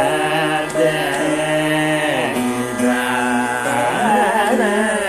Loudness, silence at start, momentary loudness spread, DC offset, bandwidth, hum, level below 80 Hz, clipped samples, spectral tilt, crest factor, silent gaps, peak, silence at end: -17 LUFS; 0 s; 3 LU; under 0.1%; 15.5 kHz; none; -50 dBFS; under 0.1%; -4 dB/octave; 14 dB; none; -2 dBFS; 0 s